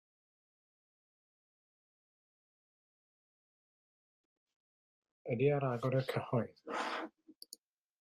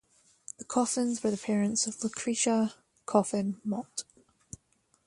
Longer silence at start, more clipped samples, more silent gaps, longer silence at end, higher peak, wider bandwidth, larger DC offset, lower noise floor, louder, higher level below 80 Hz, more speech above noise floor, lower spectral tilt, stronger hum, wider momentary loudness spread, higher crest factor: first, 5.25 s vs 0.6 s; neither; neither; about the same, 0.95 s vs 1.05 s; second, -20 dBFS vs -10 dBFS; first, 13.5 kHz vs 11.5 kHz; neither; second, -61 dBFS vs -71 dBFS; second, -36 LUFS vs -30 LUFS; second, -78 dBFS vs -70 dBFS; second, 25 dB vs 41 dB; first, -7 dB/octave vs -4 dB/octave; neither; about the same, 21 LU vs 22 LU; about the same, 22 dB vs 22 dB